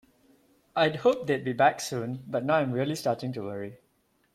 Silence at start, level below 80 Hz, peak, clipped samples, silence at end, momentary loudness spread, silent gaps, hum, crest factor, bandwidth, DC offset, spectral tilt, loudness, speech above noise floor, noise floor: 0.75 s; -70 dBFS; -8 dBFS; under 0.1%; 0.6 s; 11 LU; none; none; 20 dB; 16 kHz; under 0.1%; -5.5 dB/octave; -28 LUFS; 42 dB; -70 dBFS